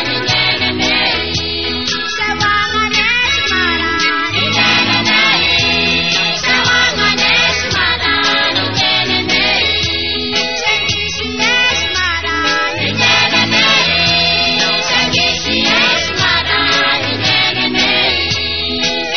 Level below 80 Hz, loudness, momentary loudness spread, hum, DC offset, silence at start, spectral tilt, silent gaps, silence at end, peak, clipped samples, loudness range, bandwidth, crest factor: -36 dBFS; -11 LUFS; 5 LU; none; 1%; 0 s; -0.5 dB/octave; none; 0 s; 0 dBFS; under 0.1%; 3 LU; 6.8 kHz; 14 dB